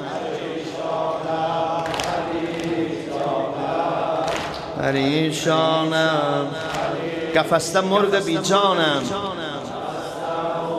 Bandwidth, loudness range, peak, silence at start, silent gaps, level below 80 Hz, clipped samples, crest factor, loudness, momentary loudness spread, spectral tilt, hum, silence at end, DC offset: 14 kHz; 4 LU; -2 dBFS; 0 s; none; -54 dBFS; under 0.1%; 20 dB; -22 LUFS; 9 LU; -4.5 dB/octave; none; 0 s; under 0.1%